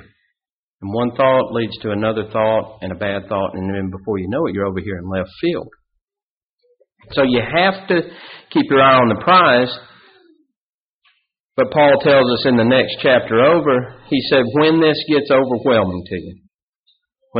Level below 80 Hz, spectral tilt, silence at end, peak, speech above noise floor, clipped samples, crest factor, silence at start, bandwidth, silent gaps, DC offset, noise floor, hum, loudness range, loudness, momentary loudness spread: -52 dBFS; -3.5 dB/octave; 0 s; -2 dBFS; over 74 dB; under 0.1%; 16 dB; 0.8 s; 5.2 kHz; 6.01-6.08 s, 6.22-6.58 s, 10.56-11.00 s, 11.40-11.49 s, 16.54-16.84 s; under 0.1%; under -90 dBFS; none; 8 LU; -16 LUFS; 13 LU